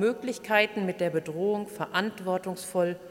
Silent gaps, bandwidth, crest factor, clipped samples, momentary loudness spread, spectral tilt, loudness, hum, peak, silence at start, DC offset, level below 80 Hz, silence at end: none; 17 kHz; 20 dB; under 0.1%; 7 LU; -5 dB/octave; -29 LUFS; none; -8 dBFS; 0 s; under 0.1%; -72 dBFS; 0 s